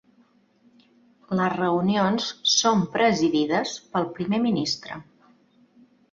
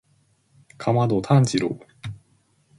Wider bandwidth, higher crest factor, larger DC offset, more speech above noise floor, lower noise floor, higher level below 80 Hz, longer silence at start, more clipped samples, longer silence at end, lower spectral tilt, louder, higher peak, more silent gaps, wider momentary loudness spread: second, 7.6 kHz vs 11.5 kHz; about the same, 18 dB vs 20 dB; neither; second, 38 dB vs 43 dB; about the same, -61 dBFS vs -63 dBFS; second, -64 dBFS vs -56 dBFS; first, 1.3 s vs 0.8 s; neither; first, 1.1 s vs 0.65 s; second, -4 dB/octave vs -6.5 dB/octave; about the same, -23 LUFS vs -21 LUFS; about the same, -6 dBFS vs -4 dBFS; neither; second, 9 LU vs 19 LU